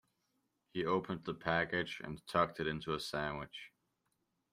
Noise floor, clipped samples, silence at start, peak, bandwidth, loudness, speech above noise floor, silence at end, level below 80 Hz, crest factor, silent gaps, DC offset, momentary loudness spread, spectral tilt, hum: -83 dBFS; under 0.1%; 0.75 s; -16 dBFS; 15.5 kHz; -38 LUFS; 45 dB; 0.85 s; -66 dBFS; 22 dB; none; under 0.1%; 12 LU; -5.5 dB/octave; none